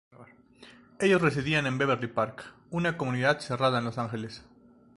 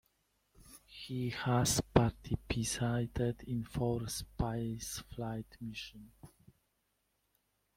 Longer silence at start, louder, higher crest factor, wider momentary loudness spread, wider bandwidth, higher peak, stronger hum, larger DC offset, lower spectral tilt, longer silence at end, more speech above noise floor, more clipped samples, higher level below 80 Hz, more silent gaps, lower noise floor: second, 0.2 s vs 0.6 s; first, -28 LUFS vs -36 LUFS; second, 20 dB vs 26 dB; about the same, 12 LU vs 14 LU; second, 11.5 kHz vs 16.5 kHz; about the same, -10 dBFS vs -10 dBFS; neither; neither; about the same, -6 dB/octave vs -5 dB/octave; second, 0.55 s vs 1.5 s; second, 26 dB vs 45 dB; neither; second, -60 dBFS vs -52 dBFS; neither; second, -54 dBFS vs -80 dBFS